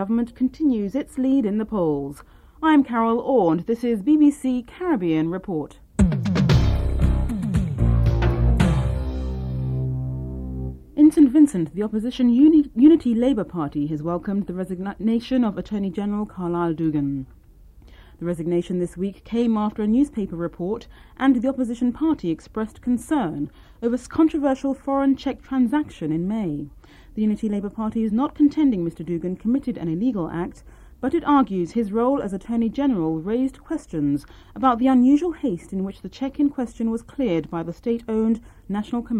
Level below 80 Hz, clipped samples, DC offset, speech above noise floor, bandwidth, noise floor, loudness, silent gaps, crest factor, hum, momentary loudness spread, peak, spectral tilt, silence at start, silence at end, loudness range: -34 dBFS; under 0.1%; under 0.1%; 27 dB; 12 kHz; -48 dBFS; -22 LUFS; none; 18 dB; none; 12 LU; -4 dBFS; -8 dB/octave; 0 s; 0 s; 6 LU